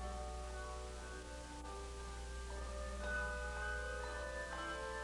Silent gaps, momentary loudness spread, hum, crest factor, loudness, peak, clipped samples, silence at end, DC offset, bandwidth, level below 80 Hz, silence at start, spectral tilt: none; 8 LU; 60 Hz at -50 dBFS; 14 dB; -46 LUFS; -30 dBFS; under 0.1%; 0 s; under 0.1%; 12 kHz; -48 dBFS; 0 s; -4 dB/octave